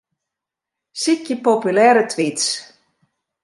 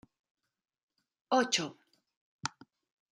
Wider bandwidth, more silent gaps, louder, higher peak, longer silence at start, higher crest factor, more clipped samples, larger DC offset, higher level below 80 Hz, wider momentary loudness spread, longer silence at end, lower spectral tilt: second, 11.5 kHz vs 15 kHz; second, none vs 2.17-2.39 s; first, -17 LUFS vs -33 LUFS; first, -2 dBFS vs -14 dBFS; second, 0.95 s vs 1.3 s; second, 18 dB vs 24 dB; neither; neither; first, -74 dBFS vs -84 dBFS; about the same, 11 LU vs 13 LU; first, 0.8 s vs 0.65 s; about the same, -3 dB/octave vs -2.5 dB/octave